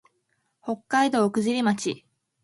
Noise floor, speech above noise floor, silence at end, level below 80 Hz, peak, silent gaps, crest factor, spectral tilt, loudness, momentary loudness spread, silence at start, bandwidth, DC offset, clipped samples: -73 dBFS; 50 dB; 0.45 s; -72 dBFS; -10 dBFS; none; 18 dB; -4.5 dB/octave; -24 LUFS; 14 LU; 0.65 s; 11.5 kHz; under 0.1%; under 0.1%